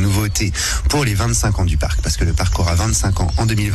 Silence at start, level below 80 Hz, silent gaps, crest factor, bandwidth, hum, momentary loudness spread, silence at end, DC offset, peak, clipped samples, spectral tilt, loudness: 0 s; -22 dBFS; none; 10 dB; 14 kHz; none; 2 LU; 0 s; under 0.1%; -6 dBFS; under 0.1%; -4.5 dB/octave; -17 LUFS